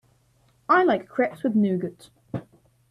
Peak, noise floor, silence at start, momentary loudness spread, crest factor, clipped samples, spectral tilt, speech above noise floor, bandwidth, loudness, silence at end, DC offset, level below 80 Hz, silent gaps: -6 dBFS; -63 dBFS; 0.7 s; 17 LU; 18 dB; under 0.1%; -8 dB/octave; 40 dB; 11.5 kHz; -23 LUFS; 0.5 s; under 0.1%; -66 dBFS; none